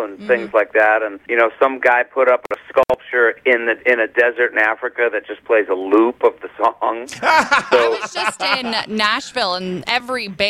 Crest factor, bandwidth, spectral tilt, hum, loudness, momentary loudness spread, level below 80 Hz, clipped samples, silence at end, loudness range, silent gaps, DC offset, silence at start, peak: 16 dB; 13.5 kHz; -3.5 dB/octave; none; -17 LUFS; 6 LU; -56 dBFS; under 0.1%; 0 s; 1 LU; none; under 0.1%; 0 s; -2 dBFS